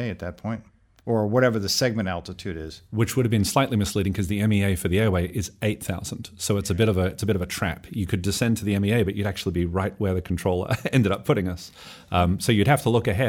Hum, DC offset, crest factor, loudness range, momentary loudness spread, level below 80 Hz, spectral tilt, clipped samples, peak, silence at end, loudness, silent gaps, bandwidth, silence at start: none; under 0.1%; 18 dB; 2 LU; 11 LU; -44 dBFS; -5.5 dB/octave; under 0.1%; -6 dBFS; 0 s; -24 LUFS; none; 17.5 kHz; 0 s